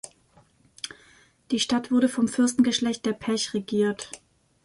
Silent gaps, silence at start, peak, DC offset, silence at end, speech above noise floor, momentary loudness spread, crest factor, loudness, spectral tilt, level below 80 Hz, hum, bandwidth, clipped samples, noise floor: none; 0.05 s; -10 dBFS; under 0.1%; 0.5 s; 36 dB; 16 LU; 16 dB; -25 LUFS; -3.5 dB/octave; -64 dBFS; none; 11.5 kHz; under 0.1%; -60 dBFS